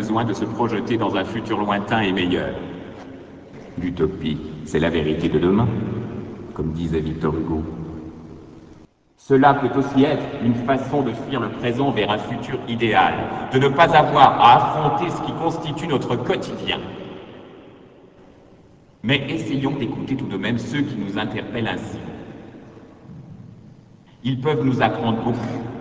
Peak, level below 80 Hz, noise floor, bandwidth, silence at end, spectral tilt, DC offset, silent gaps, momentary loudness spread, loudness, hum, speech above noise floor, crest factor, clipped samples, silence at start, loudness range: 0 dBFS; -44 dBFS; -50 dBFS; 8 kHz; 0 s; -7 dB/octave; under 0.1%; none; 20 LU; -20 LUFS; none; 31 dB; 22 dB; under 0.1%; 0 s; 11 LU